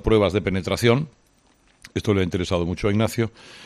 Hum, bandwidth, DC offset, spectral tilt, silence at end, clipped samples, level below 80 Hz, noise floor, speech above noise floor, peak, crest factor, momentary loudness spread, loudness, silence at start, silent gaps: none; 14 kHz; under 0.1%; -6 dB/octave; 0 s; under 0.1%; -40 dBFS; -59 dBFS; 38 dB; -6 dBFS; 18 dB; 9 LU; -22 LUFS; 0.05 s; none